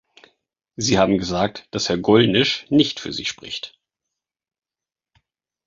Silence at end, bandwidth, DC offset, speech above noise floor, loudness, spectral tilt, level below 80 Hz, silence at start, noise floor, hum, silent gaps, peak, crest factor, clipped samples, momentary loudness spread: 2 s; 7.8 kHz; under 0.1%; over 71 dB; -19 LUFS; -4.5 dB/octave; -50 dBFS; 0.8 s; under -90 dBFS; none; none; -2 dBFS; 20 dB; under 0.1%; 14 LU